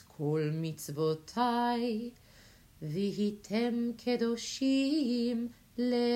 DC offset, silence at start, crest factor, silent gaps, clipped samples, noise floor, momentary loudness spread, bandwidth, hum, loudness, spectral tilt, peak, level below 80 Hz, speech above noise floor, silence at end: under 0.1%; 0.2 s; 16 dB; none; under 0.1%; -58 dBFS; 8 LU; 16 kHz; none; -33 LUFS; -6 dB/octave; -16 dBFS; -68 dBFS; 27 dB; 0 s